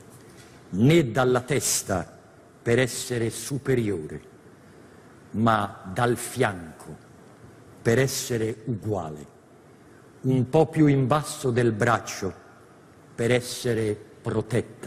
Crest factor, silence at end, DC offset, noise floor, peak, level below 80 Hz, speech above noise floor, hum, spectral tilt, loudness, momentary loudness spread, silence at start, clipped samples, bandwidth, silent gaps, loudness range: 20 dB; 0 s; under 0.1%; -52 dBFS; -6 dBFS; -54 dBFS; 28 dB; none; -5.5 dB/octave; -25 LUFS; 15 LU; 0.15 s; under 0.1%; 15.5 kHz; none; 4 LU